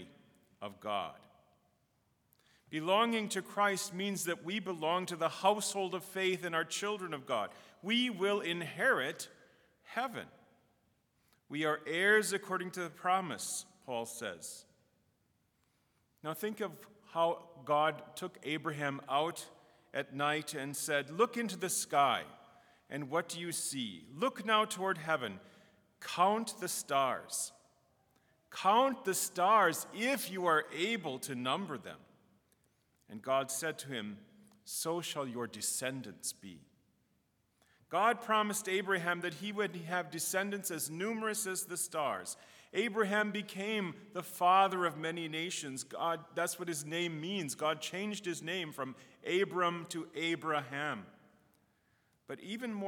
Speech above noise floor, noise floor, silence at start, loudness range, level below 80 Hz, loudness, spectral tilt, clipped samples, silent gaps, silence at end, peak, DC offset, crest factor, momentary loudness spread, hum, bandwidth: 41 dB; -77 dBFS; 0 s; 6 LU; -86 dBFS; -35 LUFS; -3 dB/octave; under 0.1%; none; 0 s; -14 dBFS; under 0.1%; 22 dB; 13 LU; none; over 20 kHz